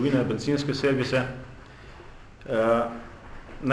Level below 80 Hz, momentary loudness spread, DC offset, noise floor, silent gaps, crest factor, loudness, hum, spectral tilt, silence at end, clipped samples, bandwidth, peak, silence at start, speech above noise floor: -48 dBFS; 23 LU; under 0.1%; -45 dBFS; none; 16 dB; -26 LUFS; none; -6.5 dB/octave; 0 s; under 0.1%; 11 kHz; -10 dBFS; 0 s; 21 dB